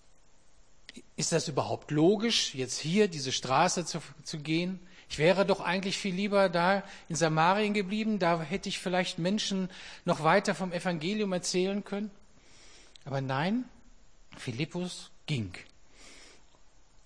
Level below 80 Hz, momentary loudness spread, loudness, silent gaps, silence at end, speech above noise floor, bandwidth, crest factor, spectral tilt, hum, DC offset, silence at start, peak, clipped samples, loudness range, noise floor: -62 dBFS; 13 LU; -30 LUFS; none; 0.75 s; 33 dB; 10.5 kHz; 20 dB; -4.5 dB/octave; none; 0.2%; 0.95 s; -10 dBFS; under 0.1%; 8 LU; -63 dBFS